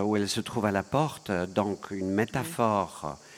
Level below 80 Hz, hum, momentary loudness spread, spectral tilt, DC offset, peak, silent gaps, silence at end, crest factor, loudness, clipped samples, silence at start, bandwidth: -60 dBFS; none; 5 LU; -5.5 dB/octave; under 0.1%; -10 dBFS; none; 0 s; 20 dB; -29 LUFS; under 0.1%; 0 s; 16.5 kHz